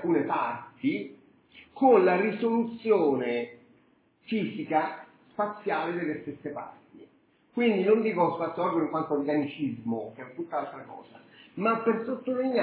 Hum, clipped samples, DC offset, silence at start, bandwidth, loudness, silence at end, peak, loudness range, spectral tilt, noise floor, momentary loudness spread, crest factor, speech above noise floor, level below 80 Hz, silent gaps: none; under 0.1%; under 0.1%; 0 s; 4 kHz; -28 LUFS; 0 s; -10 dBFS; 6 LU; -10 dB/octave; -64 dBFS; 16 LU; 18 dB; 37 dB; -74 dBFS; none